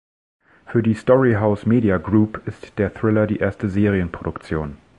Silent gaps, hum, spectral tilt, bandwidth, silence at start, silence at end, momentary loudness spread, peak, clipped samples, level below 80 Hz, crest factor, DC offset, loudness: none; none; -9.5 dB/octave; 9.2 kHz; 0.7 s; 0.25 s; 11 LU; -2 dBFS; under 0.1%; -40 dBFS; 18 dB; under 0.1%; -20 LUFS